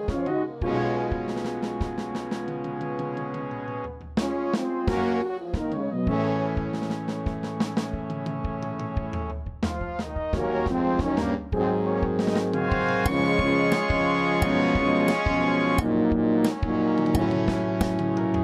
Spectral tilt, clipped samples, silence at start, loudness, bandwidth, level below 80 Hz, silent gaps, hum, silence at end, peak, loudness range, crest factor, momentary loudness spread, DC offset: -7 dB/octave; under 0.1%; 0 s; -26 LUFS; 15.5 kHz; -38 dBFS; none; none; 0 s; -8 dBFS; 8 LU; 16 dB; 9 LU; under 0.1%